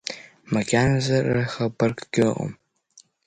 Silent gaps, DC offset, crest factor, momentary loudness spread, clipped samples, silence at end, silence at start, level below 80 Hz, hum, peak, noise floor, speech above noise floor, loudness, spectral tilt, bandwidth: none; under 0.1%; 18 dB; 12 LU; under 0.1%; 0.25 s; 0.05 s; -50 dBFS; none; -6 dBFS; -56 dBFS; 34 dB; -23 LUFS; -6 dB/octave; 9.4 kHz